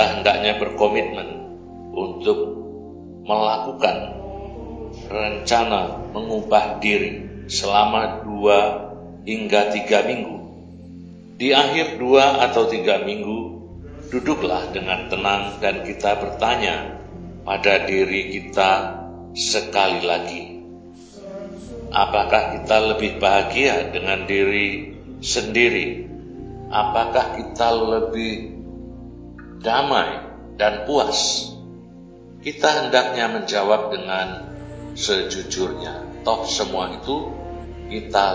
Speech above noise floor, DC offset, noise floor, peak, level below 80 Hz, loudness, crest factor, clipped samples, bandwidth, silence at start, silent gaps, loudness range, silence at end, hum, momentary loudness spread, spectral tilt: 22 dB; under 0.1%; -42 dBFS; 0 dBFS; -44 dBFS; -20 LUFS; 22 dB; under 0.1%; 8 kHz; 0 s; none; 5 LU; 0 s; none; 19 LU; -3.5 dB/octave